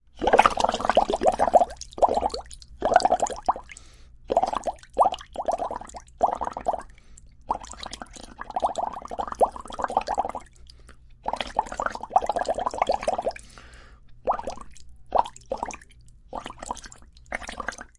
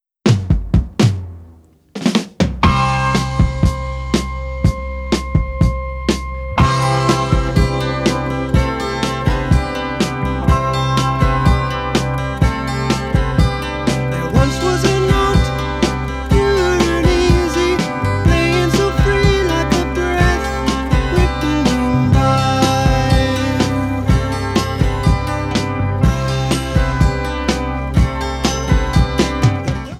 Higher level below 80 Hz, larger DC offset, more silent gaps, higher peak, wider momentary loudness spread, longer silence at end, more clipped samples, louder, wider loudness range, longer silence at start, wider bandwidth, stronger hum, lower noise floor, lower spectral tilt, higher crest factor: second, -46 dBFS vs -22 dBFS; neither; neither; second, -4 dBFS vs 0 dBFS; first, 17 LU vs 6 LU; first, 0.15 s vs 0 s; neither; second, -26 LUFS vs -16 LUFS; first, 9 LU vs 3 LU; about the same, 0.15 s vs 0.25 s; second, 11.5 kHz vs 14 kHz; neither; first, -50 dBFS vs -44 dBFS; second, -3.5 dB/octave vs -6 dB/octave; first, 24 dB vs 16 dB